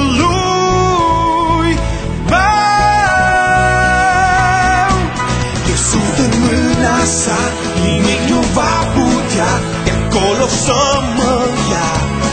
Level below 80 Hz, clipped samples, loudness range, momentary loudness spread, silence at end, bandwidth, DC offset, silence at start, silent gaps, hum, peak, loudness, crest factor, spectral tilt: -24 dBFS; under 0.1%; 2 LU; 5 LU; 0 s; 9.4 kHz; under 0.1%; 0 s; none; none; 0 dBFS; -12 LUFS; 12 dB; -4 dB/octave